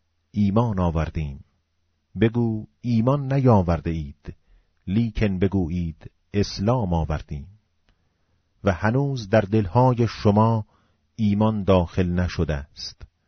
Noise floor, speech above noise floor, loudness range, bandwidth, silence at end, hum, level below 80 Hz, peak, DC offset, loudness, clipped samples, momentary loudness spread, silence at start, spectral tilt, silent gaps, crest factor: -70 dBFS; 49 dB; 5 LU; 6.6 kHz; 0.2 s; none; -38 dBFS; -6 dBFS; under 0.1%; -23 LUFS; under 0.1%; 16 LU; 0.35 s; -7.5 dB/octave; none; 18 dB